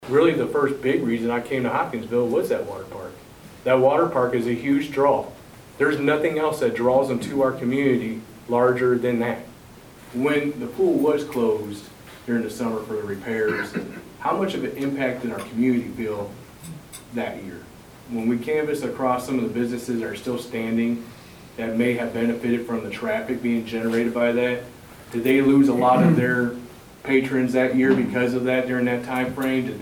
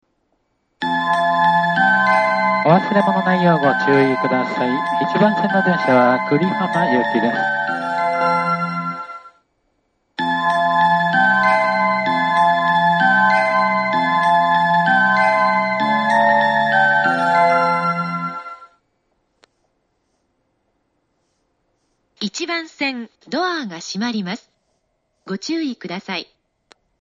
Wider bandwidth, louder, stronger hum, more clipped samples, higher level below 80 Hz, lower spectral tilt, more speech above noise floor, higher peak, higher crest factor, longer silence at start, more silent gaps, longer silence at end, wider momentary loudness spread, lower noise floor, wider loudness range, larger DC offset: first, 19 kHz vs 9.2 kHz; second, -23 LUFS vs -17 LUFS; neither; neither; first, -56 dBFS vs -66 dBFS; about the same, -6.5 dB/octave vs -5.5 dB/octave; second, 23 dB vs 52 dB; second, -4 dBFS vs 0 dBFS; about the same, 18 dB vs 18 dB; second, 0 s vs 0.8 s; neither; second, 0 s vs 0.8 s; first, 15 LU vs 12 LU; second, -45 dBFS vs -68 dBFS; second, 6 LU vs 11 LU; neither